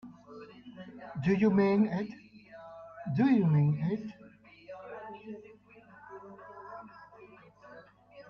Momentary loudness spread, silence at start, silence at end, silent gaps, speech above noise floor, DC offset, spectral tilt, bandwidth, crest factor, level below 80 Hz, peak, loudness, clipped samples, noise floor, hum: 26 LU; 0.05 s; 0.1 s; none; 30 dB; under 0.1%; -9.5 dB/octave; 6.4 kHz; 18 dB; -68 dBFS; -16 dBFS; -29 LUFS; under 0.1%; -57 dBFS; none